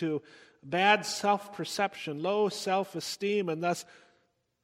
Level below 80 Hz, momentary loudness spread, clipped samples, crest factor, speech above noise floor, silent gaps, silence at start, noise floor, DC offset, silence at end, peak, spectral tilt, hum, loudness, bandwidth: -78 dBFS; 11 LU; under 0.1%; 22 dB; 42 dB; none; 0 s; -73 dBFS; under 0.1%; 0.8 s; -10 dBFS; -4 dB/octave; none; -30 LUFS; 16.5 kHz